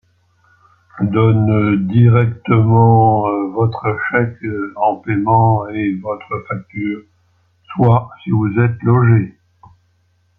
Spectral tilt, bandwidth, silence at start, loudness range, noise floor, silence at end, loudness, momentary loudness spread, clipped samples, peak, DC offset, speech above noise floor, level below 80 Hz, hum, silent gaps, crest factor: -11.5 dB/octave; 4.2 kHz; 0.95 s; 5 LU; -59 dBFS; 1.1 s; -15 LUFS; 13 LU; under 0.1%; -2 dBFS; under 0.1%; 45 dB; -52 dBFS; none; none; 14 dB